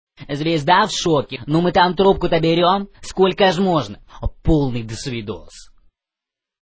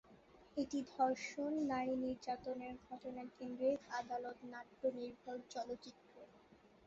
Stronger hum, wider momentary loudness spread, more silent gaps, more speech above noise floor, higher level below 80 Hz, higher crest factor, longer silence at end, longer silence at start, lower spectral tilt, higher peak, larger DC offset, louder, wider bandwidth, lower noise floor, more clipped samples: neither; about the same, 14 LU vs 14 LU; neither; first, 69 dB vs 24 dB; first, -36 dBFS vs -76 dBFS; about the same, 18 dB vs 18 dB; first, 1 s vs 0.2 s; about the same, 0.2 s vs 0.1 s; first, -5.5 dB/octave vs -3.5 dB/octave; first, 0 dBFS vs -24 dBFS; neither; first, -18 LUFS vs -43 LUFS; about the same, 8 kHz vs 7.6 kHz; first, -87 dBFS vs -67 dBFS; neither